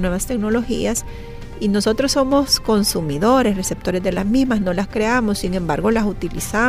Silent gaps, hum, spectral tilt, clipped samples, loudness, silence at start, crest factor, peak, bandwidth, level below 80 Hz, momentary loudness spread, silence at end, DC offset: none; none; -4.5 dB/octave; under 0.1%; -19 LUFS; 0 s; 16 dB; -4 dBFS; 16 kHz; -32 dBFS; 7 LU; 0 s; under 0.1%